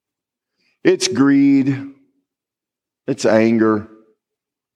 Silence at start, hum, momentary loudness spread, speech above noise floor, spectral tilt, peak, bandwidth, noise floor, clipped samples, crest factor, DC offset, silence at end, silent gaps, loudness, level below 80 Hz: 0.85 s; none; 14 LU; 72 dB; -5 dB/octave; -2 dBFS; 11 kHz; -86 dBFS; under 0.1%; 18 dB; under 0.1%; 0.9 s; none; -16 LUFS; -70 dBFS